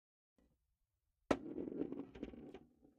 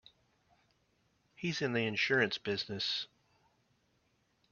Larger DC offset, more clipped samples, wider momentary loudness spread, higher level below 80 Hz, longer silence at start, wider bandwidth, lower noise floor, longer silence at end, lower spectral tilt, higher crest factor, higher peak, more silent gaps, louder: neither; neither; first, 16 LU vs 9 LU; first, -68 dBFS vs -76 dBFS; about the same, 1.3 s vs 1.4 s; first, 8.4 kHz vs 7 kHz; first, -87 dBFS vs -75 dBFS; second, 0.15 s vs 1.45 s; first, -6 dB/octave vs -2.5 dB/octave; about the same, 28 dB vs 24 dB; second, -20 dBFS vs -14 dBFS; neither; second, -45 LUFS vs -34 LUFS